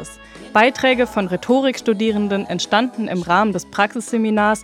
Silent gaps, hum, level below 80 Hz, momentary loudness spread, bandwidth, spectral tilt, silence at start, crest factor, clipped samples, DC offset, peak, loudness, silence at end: none; none; -52 dBFS; 6 LU; 14.5 kHz; -4.5 dB/octave; 0 s; 18 dB; under 0.1%; under 0.1%; 0 dBFS; -18 LUFS; 0 s